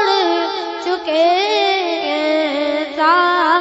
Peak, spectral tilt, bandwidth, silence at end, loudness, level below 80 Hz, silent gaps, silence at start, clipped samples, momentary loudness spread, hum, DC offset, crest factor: -2 dBFS; -2 dB/octave; 8 kHz; 0 s; -16 LUFS; -62 dBFS; none; 0 s; under 0.1%; 8 LU; none; under 0.1%; 14 dB